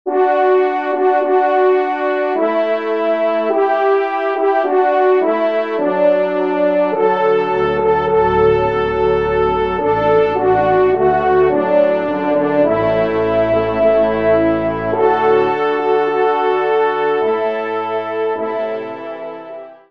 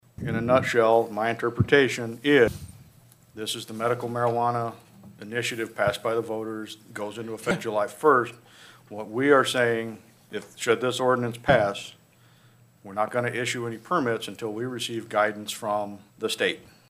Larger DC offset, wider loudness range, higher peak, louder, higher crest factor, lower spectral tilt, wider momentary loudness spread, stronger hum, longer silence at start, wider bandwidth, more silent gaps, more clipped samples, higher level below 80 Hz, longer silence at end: first, 0.3% vs under 0.1%; second, 2 LU vs 6 LU; about the same, -2 dBFS vs -4 dBFS; first, -15 LUFS vs -25 LUFS; second, 14 dB vs 22 dB; first, -8 dB/octave vs -5 dB/octave; second, 6 LU vs 16 LU; neither; second, 0.05 s vs 0.2 s; second, 6 kHz vs 15.5 kHz; neither; neither; first, -42 dBFS vs -58 dBFS; second, 0.15 s vs 0.3 s